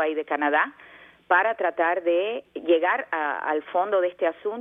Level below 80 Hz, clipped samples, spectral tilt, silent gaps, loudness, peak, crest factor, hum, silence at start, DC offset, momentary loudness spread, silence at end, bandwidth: -74 dBFS; under 0.1%; -6 dB/octave; none; -24 LUFS; -6 dBFS; 18 dB; none; 0 s; under 0.1%; 6 LU; 0 s; 3.8 kHz